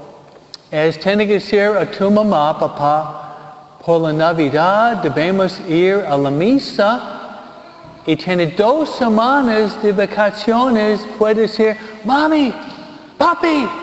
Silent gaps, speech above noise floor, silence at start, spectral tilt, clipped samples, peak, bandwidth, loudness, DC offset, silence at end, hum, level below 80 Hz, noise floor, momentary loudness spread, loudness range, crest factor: none; 26 dB; 0 s; -6.5 dB/octave; under 0.1%; 0 dBFS; 8.2 kHz; -15 LUFS; under 0.1%; 0 s; none; -52 dBFS; -40 dBFS; 12 LU; 2 LU; 14 dB